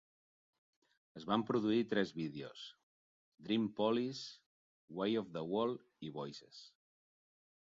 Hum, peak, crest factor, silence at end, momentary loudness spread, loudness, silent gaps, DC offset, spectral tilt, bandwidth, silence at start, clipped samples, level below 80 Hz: none; -20 dBFS; 20 dB; 0.95 s; 18 LU; -38 LUFS; 2.83-3.32 s, 4.46-4.88 s; under 0.1%; -4.5 dB/octave; 7.4 kHz; 1.15 s; under 0.1%; -78 dBFS